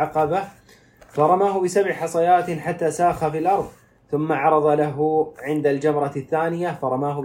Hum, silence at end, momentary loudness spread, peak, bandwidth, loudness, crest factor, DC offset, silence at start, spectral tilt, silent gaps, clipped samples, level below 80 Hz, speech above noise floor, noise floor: none; 0 s; 8 LU; -4 dBFS; 16 kHz; -21 LUFS; 16 dB; under 0.1%; 0 s; -6.5 dB/octave; none; under 0.1%; -56 dBFS; 30 dB; -51 dBFS